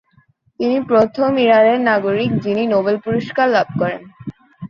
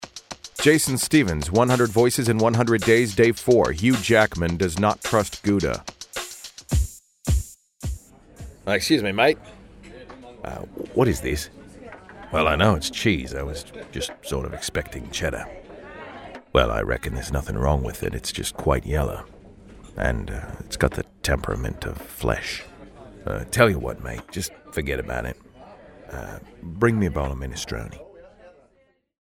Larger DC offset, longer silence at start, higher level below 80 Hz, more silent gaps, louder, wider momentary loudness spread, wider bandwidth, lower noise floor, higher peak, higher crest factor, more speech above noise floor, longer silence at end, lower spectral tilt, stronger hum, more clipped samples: neither; first, 0.6 s vs 0 s; second, -56 dBFS vs -36 dBFS; neither; first, -16 LUFS vs -23 LUFS; second, 11 LU vs 20 LU; second, 7 kHz vs 16.5 kHz; second, -56 dBFS vs -63 dBFS; about the same, 0 dBFS vs -2 dBFS; second, 16 dB vs 22 dB; about the same, 41 dB vs 41 dB; second, 0 s vs 0.75 s; first, -7.5 dB/octave vs -5 dB/octave; neither; neither